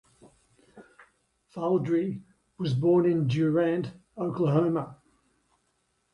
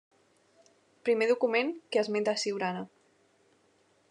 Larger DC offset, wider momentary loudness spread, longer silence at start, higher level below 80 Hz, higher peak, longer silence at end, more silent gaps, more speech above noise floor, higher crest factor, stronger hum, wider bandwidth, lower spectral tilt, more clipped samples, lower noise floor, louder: neither; first, 14 LU vs 9 LU; second, 0.75 s vs 1.05 s; first, -66 dBFS vs under -90 dBFS; about the same, -12 dBFS vs -12 dBFS; about the same, 1.2 s vs 1.25 s; neither; first, 48 dB vs 39 dB; about the same, 16 dB vs 20 dB; neither; about the same, 9.8 kHz vs 10.5 kHz; first, -9 dB/octave vs -4 dB/octave; neither; first, -74 dBFS vs -68 dBFS; first, -27 LUFS vs -30 LUFS